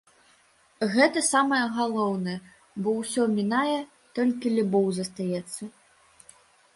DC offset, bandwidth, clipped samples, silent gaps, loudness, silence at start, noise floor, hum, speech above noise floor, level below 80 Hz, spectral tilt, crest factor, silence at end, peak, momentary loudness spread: under 0.1%; 11.5 kHz; under 0.1%; none; -26 LUFS; 0.8 s; -61 dBFS; none; 36 dB; -68 dBFS; -4.5 dB/octave; 20 dB; 1.05 s; -6 dBFS; 14 LU